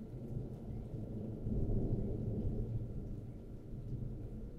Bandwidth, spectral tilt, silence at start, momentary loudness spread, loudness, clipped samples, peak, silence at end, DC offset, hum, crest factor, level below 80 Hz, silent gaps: 4.3 kHz; -11 dB/octave; 0 s; 10 LU; -43 LUFS; under 0.1%; -24 dBFS; 0 s; under 0.1%; none; 16 dB; -44 dBFS; none